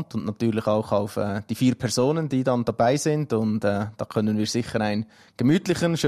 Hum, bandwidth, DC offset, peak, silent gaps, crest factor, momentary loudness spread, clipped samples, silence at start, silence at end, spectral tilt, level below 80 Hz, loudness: none; 15 kHz; under 0.1%; -10 dBFS; none; 14 dB; 6 LU; under 0.1%; 0 s; 0 s; -6 dB/octave; -56 dBFS; -24 LUFS